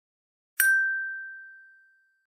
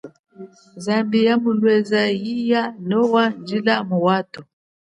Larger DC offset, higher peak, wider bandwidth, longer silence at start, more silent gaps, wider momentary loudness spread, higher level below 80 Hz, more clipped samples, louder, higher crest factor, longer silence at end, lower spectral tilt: neither; second, -6 dBFS vs -2 dBFS; first, 15 kHz vs 10.5 kHz; first, 0.6 s vs 0.05 s; second, none vs 0.19-0.24 s; first, 20 LU vs 6 LU; second, under -90 dBFS vs -68 dBFS; neither; second, -24 LUFS vs -19 LUFS; first, 24 dB vs 16 dB; first, 0.7 s vs 0.45 s; second, 6 dB/octave vs -6.5 dB/octave